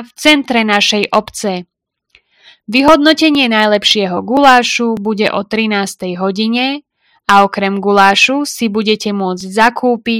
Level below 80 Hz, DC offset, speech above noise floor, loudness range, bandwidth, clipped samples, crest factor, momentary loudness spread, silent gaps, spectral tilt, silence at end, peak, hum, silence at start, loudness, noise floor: -48 dBFS; under 0.1%; 42 dB; 3 LU; over 20 kHz; 0.9%; 12 dB; 10 LU; none; -3.5 dB/octave; 0 s; 0 dBFS; none; 0 s; -11 LUFS; -53 dBFS